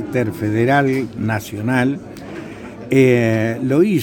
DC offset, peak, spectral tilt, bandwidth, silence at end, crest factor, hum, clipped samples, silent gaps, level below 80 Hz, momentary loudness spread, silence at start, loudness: under 0.1%; -2 dBFS; -7 dB/octave; 19.5 kHz; 0 s; 16 dB; none; under 0.1%; none; -50 dBFS; 18 LU; 0 s; -17 LUFS